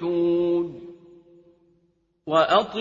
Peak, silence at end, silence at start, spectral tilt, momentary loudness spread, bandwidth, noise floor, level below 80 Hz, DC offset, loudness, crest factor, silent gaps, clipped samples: -6 dBFS; 0 s; 0 s; -6 dB/octave; 23 LU; 7.4 kHz; -67 dBFS; -64 dBFS; under 0.1%; -22 LUFS; 18 dB; none; under 0.1%